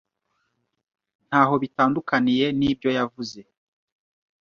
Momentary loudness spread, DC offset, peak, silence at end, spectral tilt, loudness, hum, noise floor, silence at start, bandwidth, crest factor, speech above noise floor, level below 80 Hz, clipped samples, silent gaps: 9 LU; under 0.1%; -4 dBFS; 1 s; -6 dB/octave; -22 LUFS; none; -76 dBFS; 1.3 s; 7 kHz; 20 dB; 54 dB; -58 dBFS; under 0.1%; none